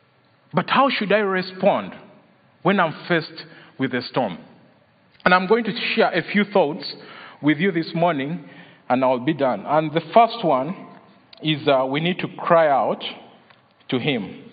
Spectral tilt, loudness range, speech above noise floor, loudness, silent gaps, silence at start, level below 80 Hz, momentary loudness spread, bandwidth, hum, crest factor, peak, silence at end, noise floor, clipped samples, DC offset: -10 dB/octave; 3 LU; 38 dB; -21 LUFS; none; 0.55 s; -68 dBFS; 14 LU; 5.2 kHz; none; 20 dB; -2 dBFS; 0.1 s; -58 dBFS; under 0.1%; under 0.1%